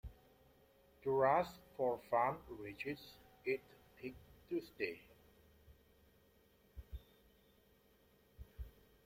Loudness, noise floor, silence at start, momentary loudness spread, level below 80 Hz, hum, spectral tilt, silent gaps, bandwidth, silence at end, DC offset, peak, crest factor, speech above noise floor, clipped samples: -41 LUFS; -71 dBFS; 0.05 s; 24 LU; -62 dBFS; none; -6.5 dB/octave; none; 16.5 kHz; 0.35 s; under 0.1%; -22 dBFS; 22 dB; 32 dB; under 0.1%